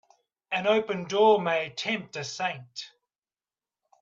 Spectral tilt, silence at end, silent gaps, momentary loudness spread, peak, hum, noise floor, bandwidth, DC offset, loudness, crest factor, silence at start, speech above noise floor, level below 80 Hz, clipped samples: -4 dB/octave; 1.15 s; none; 18 LU; -10 dBFS; none; under -90 dBFS; 7.6 kHz; under 0.1%; -26 LUFS; 20 dB; 0.5 s; over 64 dB; -76 dBFS; under 0.1%